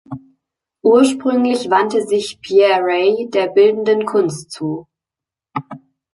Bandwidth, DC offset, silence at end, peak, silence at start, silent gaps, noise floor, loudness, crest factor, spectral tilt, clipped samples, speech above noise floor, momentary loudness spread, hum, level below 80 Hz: 11.5 kHz; under 0.1%; 0.35 s; -2 dBFS; 0.1 s; none; -87 dBFS; -15 LUFS; 14 dB; -5 dB/octave; under 0.1%; 73 dB; 16 LU; none; -62 dBFS